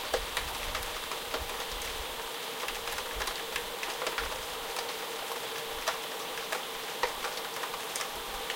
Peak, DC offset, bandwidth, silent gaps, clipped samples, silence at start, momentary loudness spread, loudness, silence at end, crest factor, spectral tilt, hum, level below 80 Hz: -14 dBFS; under 0.1%; 17 kHz; none; under 0.1%; 0 s; 3 LU; -34 LUFS; 0 s; 22 dB; -1 dB/octave; none; -50 dBFS